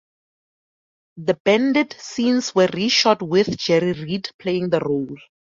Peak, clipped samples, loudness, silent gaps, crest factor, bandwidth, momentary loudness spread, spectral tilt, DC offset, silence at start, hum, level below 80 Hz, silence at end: -2 dBFS; under 0.1%; -20 LUFS; 1.40-1.45 s, 4.34-4.39 s; 18 dB; 7.6 kHz; 9 LU; -4.5 dB/octave; under 0.1%; 1.15 s; none; -60 dBFS; 0.4 s